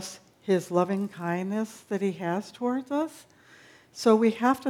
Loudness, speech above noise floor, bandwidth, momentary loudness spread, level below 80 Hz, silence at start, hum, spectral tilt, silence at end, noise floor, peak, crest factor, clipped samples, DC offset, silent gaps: -27 LUFS; 28 dB; 16 kHz; 12 LU; -76 dBFS; 0 s; none; -6 dB/octave; 0 s; -55 dBFS; -8 dBFS; 20 dB; under 0.1%; under 0.1%; none